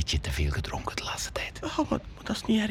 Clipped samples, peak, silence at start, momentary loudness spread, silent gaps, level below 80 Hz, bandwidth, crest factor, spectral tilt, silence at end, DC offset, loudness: under 0.1%; -12 dBFS; 0 s; 6 LU; none; -38 dBFS; 17 kHz; 18 dB; -4.5 dB/octave; 0 s; under 0.1%; -31 LUFS